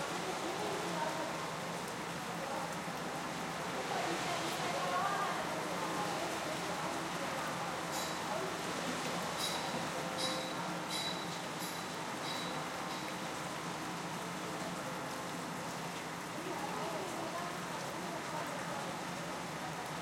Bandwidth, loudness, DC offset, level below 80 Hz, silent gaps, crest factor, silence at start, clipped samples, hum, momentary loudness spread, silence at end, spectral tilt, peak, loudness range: 16.5 kHz; -39 LUFS; under 0.1%; -70 dBFS; none; 16 dB; 0 s; under 0.1%; none; 5 LU; 0 s; -3.5 dB/octave; -22 dBFS; 4 LU